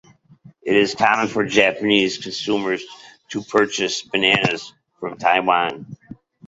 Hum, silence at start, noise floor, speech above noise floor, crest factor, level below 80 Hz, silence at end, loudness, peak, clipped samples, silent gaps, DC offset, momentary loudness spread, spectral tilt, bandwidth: none; 0.65 s; -49 dBFS; 30 dB; 20 dB; -58 dBFS; 0.35 s; -19 LUFS; -2 dBFS; under 0.1%; none; under 0.1%; 16 LU; -3.5 dB/octave; 8 kHz